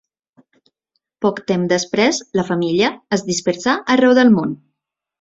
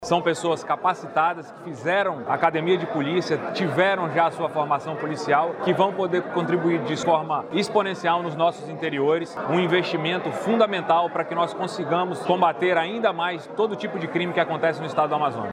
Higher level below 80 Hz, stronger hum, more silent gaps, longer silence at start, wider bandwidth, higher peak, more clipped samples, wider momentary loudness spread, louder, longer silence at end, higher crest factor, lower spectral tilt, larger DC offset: first, -58 dBFS vs -70 dBFS; neither; neither; first, 1.2 s vs 0 s; second, 8 kHz vs 11.5 kHz; first, -2 dBFS vs -6 dBFS; neither; first, 9 LU vs 5 LU; first, -17 LUFS vs -23 LUFS; first, 0.65 s vs 0 s; about the same, 16 dB vs 18 dB; about the same, -4.5 dB/octave vs -5.5 dB/octave; neither